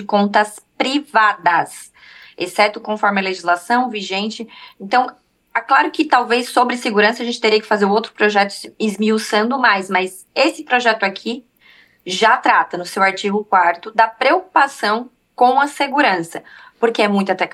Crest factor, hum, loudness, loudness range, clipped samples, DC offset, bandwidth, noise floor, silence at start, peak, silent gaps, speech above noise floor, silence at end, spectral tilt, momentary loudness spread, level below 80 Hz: 16 dB; none; -16 LUFS; 3 LU; under 0.1%; under 0.1%; 13 kHz; -50 dBFS; 0 s; 0 dBFS; none; 33 dB; 0.05 s; -4 dB/octave; 10 LU; -70 dBFS